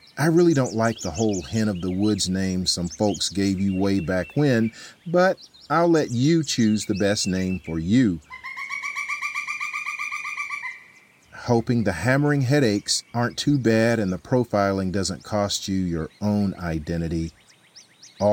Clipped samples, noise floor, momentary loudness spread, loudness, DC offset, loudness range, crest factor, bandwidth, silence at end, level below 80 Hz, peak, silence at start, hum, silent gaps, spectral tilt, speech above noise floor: under 0.1%; -53 dBFS; 8 LU; -23 LUFS; under 0.1%; 5 LU; 16 dB; 17 kHz; 0 s; -48 dBFS; -6 dBFS; 0.15 s; none; none; -5 dB/octave; 31 dB